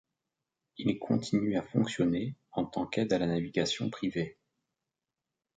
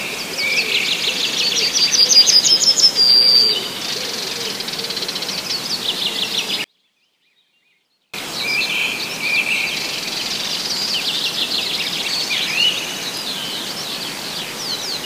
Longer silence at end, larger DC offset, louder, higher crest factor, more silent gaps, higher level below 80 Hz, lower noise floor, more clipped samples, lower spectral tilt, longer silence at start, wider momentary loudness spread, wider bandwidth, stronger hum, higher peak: first, 1.25 s vs 0 s; neither; second, -32 LUFS vs -16 LUFS; about the same, 20 dB vs 20 dB; neither; about the same, -64 dBFS vs -62 dBFS; first, -89 dBFS vs -64 dBFS; neither; first, -6 dB/octave vs 0.5 dB/octave; first, 0.8 s vs 0 s; second, 6 LU vs 14 LU; second, 9.2 kHz vs 16 kHz; neither; second, -14 dBFS vs 0 dBFS